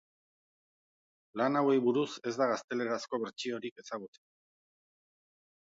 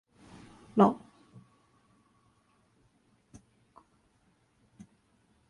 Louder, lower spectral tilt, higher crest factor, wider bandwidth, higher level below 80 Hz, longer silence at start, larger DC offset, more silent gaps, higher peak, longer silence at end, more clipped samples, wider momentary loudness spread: second, -33 LUFS vs -28 LUFS; second, -5 dB/octave vs -8.5 dB/octave; second, 18 dB vs 26 dB; second, 7.8 kHz vs 10.5 kHz; second, -86 dBFS vs -70 dBFS; first, 1.35 s vs 0.75 s; neither; first, 2.64-2.68 s, 3.71-3.76 s vs none; second, -16 dBFS vs -10 dBFS; second, 1.7 s vs 4.55 s; neither; second, 15 LU vs 29 LU